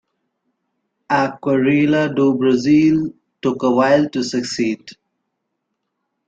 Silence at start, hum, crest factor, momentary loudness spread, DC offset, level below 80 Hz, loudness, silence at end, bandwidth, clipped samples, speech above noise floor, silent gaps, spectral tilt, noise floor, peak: 1.1 s; none; 16 dB; 9 LU; under 0.1%; -58 dBFS; -17 LUFS; 1.35 s; 7.8 kHz; under 0.1%; 59 dB; none; -6 dB/octave; -75 dBFS; -2 dBFS